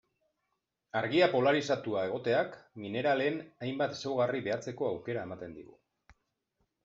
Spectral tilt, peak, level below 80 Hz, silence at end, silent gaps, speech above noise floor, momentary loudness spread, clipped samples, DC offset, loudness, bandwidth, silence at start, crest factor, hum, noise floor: -4 dB/octave; -12 dBFS; -74 dBFS; 1.2 s; none; 52 dB; 13 LU; under 0.1%; under 0.1%; -32 LUFS; 7.8 kHz; 0.95 s; 20 dB; none; -83 dBFS